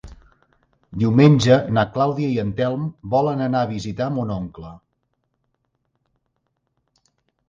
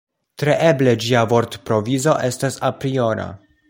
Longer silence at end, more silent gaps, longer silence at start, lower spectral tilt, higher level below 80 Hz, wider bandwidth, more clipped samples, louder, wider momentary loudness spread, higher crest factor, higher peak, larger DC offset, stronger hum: first, 2.7 s vs 0.35 s; neither; second, 0.05 s vs 0.4 s; first, -7.5 dB/octave vs -5.5 dB/octave; about the same, -50 dBFS vs -54 dBFS; second, 7.6 kHz vs 16.5 kHz; neither; about the same, -19 LUFS vs -18 LUFS; first, 16 LU vs 7 LU; about the same, 20 dB vs 18 dB; about the same, 0 dBFS vs -2 dBFS; neither; neither